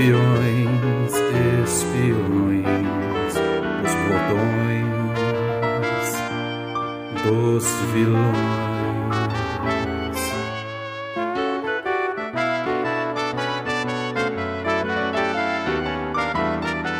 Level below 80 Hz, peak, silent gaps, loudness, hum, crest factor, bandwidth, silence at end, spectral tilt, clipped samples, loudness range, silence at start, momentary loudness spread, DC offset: -46 dBFS; -6 dBFS; none; -22 LUFS; none; 16 dB; 16 kHz; 0 s; -5.5 dB/octave; under 0.1%; 4 LU; 0 s; 6 LU; under 0.1%